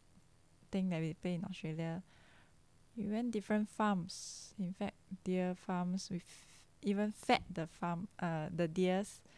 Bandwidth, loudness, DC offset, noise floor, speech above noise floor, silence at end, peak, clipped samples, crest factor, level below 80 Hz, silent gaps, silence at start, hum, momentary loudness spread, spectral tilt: 11 kHz; -39 LUFS; under 0.1%; -68 dBFS; 30 dB; 0.2 s; -16 dBFS; under 0.1%; 24 dB; -68 dBFS; none; 0.7 s; none; 10 LU; -6 dB/octave